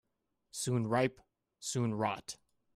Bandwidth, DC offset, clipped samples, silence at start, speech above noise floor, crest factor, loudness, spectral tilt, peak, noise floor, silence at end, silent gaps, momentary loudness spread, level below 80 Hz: 15.5 kHz; under 0.1%; under 0.1%; 0.55 s; 48 dB; 20 dB; -35 LUFS; -5 dB/octave; -18 dBFS; -82 dBFS; 0.4 s; none; 15 LU; -72 dBFS